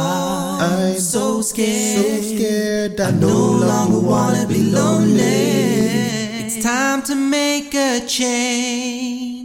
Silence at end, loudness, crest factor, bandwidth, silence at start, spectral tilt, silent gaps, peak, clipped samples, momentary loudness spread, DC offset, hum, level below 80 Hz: 0 s; -17 LUFS; 12 dB; 17 kHz; 0 s; -4.5 dB/octave; none; -4 dBFS; under 0.1%; 6 LU; under 0.1%; none; -50 dBFS